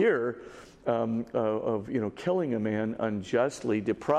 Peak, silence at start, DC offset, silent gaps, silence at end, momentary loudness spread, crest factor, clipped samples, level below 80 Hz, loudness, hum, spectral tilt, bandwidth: -12 dBFS; 0 s; under 0.1%; none; 0 s; 5 LU; 16 dB; under 0.1%; -64 dBFS; -30 LUFS; none; -6.5 dB/octave; 11 kHz